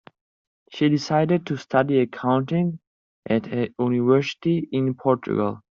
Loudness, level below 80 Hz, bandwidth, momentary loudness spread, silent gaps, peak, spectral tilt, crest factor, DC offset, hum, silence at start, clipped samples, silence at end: -23 LUFS; -64 dBFS; 7.4 kHz; 6 LU; 2.87-3.23 s; -4 dBFS; -6.5 dB/octave; 18 dB; under 0.1%; none; 0.7 s; under 0.1%; 0.2 s